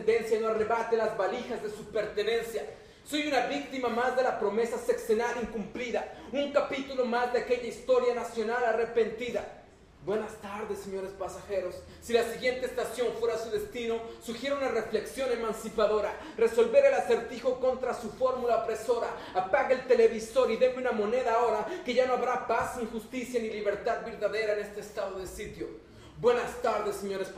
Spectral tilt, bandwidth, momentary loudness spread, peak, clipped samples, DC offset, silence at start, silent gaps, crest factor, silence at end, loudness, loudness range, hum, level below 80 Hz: -4 dB/octave; 15 kHz; 10 LU; -10 dBFS; under 0.1%; under 0.1%; 0 s; none; 20 dB; 0 s; -30 LUFS; 5 LU; none; -58 dBFS